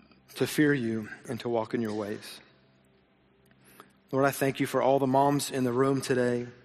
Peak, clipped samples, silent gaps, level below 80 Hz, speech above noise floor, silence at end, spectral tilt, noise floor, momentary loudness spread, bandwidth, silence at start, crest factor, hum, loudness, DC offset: -10 dBFS; under 0.1%; none; -68 dBFS; 37 dB; 0.1 s; -5.5 dB/octave; -64 dBFS; 13 LU; 13.5 kHz; 0.3 s; 18 dB; none; -28 LUFS; under 0.1%